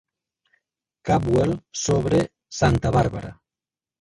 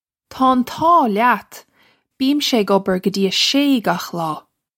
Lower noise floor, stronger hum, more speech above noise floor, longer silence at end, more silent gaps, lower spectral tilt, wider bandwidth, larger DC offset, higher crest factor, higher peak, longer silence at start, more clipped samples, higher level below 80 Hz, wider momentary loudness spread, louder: first, under -90 dBFS vs -58 dBFS; neither; first, over 69 dB vs 41 dB; first, 0.7 s vs 0.4 s; neither; first, -6 dB/octave vs -4 dB/octave; second, 11.5 kHz vs 16.5 kHz; neither; about the same, 18 dB vs 16 dB; second, -6 dBFS vs -2 dBFS; first, 1.05 s vs 0.3 s; neither; first, -40 dBFS vs -58 dBFS; first, 13 LU vs 9 LU; second, -22 LUFS vs -17 LUFS